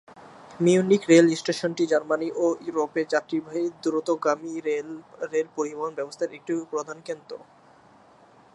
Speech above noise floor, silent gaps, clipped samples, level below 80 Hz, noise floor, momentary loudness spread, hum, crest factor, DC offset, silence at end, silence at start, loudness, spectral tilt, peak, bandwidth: 30 dB; none; under 0.1%; -76 dBFS; -54 dBFS; 16 LU; none; 20 dB; under 0.1%; 1.15 s; 0.15 s; -25 LUFS; -5.5 dB/octave; -4 dBFS; 11.5 kHz